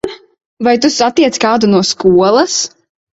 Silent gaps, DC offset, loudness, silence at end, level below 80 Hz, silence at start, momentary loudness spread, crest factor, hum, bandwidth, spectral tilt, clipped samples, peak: 0.45-0.57 s; under 0.1%; -11 LUFS; 0.5 s; -50 dBFS; 0.05 s; 7 LU; 12 dB; none; 8 kHz; -4 dB/octave; under 0.1%; 0 dBFS